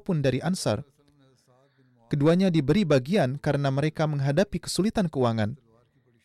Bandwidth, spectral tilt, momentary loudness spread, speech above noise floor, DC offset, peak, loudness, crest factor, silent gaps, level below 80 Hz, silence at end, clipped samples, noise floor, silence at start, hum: 13.5 kHz; -6.5 dB/octave; 7 LU; 39 dB; under 0.1%; -12 dBFS; -25 LUFS; 14 dB; none; -54 dBFS; 0.7 s; under 0.1%; -63 dBFS; 0.1 s; none